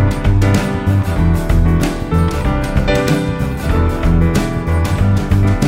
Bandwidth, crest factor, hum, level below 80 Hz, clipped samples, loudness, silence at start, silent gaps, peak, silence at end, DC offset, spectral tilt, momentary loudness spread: 16 kHz; 14 dB; none; -20 dBFS; under 0.1%; -15 LUFS; 0 s; none; 0 dBFS; 0 s; under 0.1%; -7 dB/octave; 3 LU